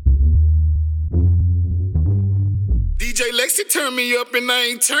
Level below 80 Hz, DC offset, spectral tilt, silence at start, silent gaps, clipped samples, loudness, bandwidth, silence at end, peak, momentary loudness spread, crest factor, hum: -20 dBFS; under 0.1%; -3.5 dB/octave; 0 s; none; under 0.1%; -18 LUFS; 18 kHz; 0 s; -4 dBFS; 5 LU; 14 dB; none